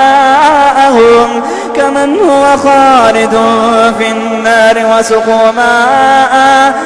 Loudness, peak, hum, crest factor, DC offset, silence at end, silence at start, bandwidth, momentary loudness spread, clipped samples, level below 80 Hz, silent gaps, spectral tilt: -6 LUFS; 0 dBFS; none; 6 dB; under 0.1%; 0 s; 0 s; 11 kHz; 6 LU; 1%; -40 dBFS; none; -3.5 dB/octave